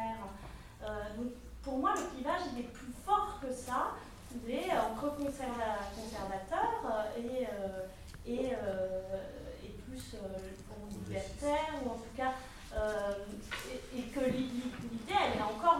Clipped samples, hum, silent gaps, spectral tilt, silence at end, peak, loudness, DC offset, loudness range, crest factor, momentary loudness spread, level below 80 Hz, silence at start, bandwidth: under 0.1%; none; none; -5 dB/octave; 0 s; -16 dBFS; -38 LUFS; under 0.1%; 4 LU; 22 dB; 13 LU; -54 dBFS; 0 s; 16.5 kHz